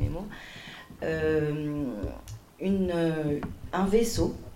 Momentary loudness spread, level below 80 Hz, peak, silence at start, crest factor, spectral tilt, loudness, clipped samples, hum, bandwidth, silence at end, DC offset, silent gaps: 17 LU; -42 dBFS; -12 dBFS; 0 s; 18 dB; -6 dB/octave; -29 LUFS; under 0.1%; none; 16 kHz; 0 s; under 0.1%; none